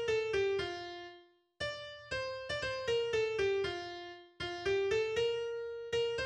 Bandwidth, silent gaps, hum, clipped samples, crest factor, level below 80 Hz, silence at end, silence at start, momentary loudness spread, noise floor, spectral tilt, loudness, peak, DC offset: 9.8 kHz; none; none; under 0.1%; 14 dB; -62 dBFS; 0 s; 0 s; 12 LU; -60 dBFS; -4 dB/octave; -36 LUFS; -22 dBFS; under 0.1%